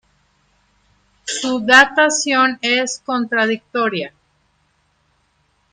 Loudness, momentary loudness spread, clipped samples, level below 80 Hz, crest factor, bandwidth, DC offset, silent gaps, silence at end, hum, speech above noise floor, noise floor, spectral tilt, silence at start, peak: -15 LUFS; 15 LU; under 0.1%; -62 dBFS; 20 dB; 13.5 kHz; under 0.1%; none; 1.65 s; none; 46 dB; -63 dBFS; -1.5 dB/octave; 1.25 s; 0 dBFS